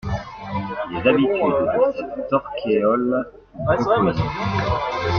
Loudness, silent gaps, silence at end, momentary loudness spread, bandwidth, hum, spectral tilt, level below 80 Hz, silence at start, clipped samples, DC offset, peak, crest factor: -21 LUFS; none; 0 s; 11 LU; 6.8 kHz; none; -7.5 dB/octave; -42 dBFS; 0.05 s; under 0.1%; under 0.1%; -4 dBFS; 16 dB